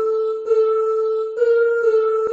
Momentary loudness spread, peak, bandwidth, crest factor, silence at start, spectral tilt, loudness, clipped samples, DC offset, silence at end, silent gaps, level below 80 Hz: 4 LU; -8 dBFS; 7 kHz; 10 dB; 0 s; -1 dB/octave; -18 LUFS; under 0.1%; under 0.1%; 0 s; none; -66 dBFS